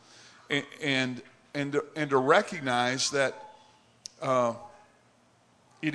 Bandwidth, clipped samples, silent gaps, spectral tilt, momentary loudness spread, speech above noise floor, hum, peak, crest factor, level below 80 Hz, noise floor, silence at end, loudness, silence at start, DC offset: 11 kHz; under 0.1%; none; -3.5 dB/octave; 19 LU; 36 dB; none; -6 dBFS; 24 dB; -78 dBFS; -64 dBFS; 0 s; -28 LUFS; 0.5 s; under 0.1%